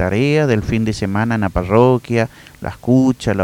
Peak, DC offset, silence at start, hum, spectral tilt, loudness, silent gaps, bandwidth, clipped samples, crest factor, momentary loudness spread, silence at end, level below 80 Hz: 0 dBFS; under 0.1%; 0 s; none; -7 dB/octave; -16 LUFS; none; 15.5 kHz; under 0.1%; 16 dB; 11 LU; 0 s; -36 dBFS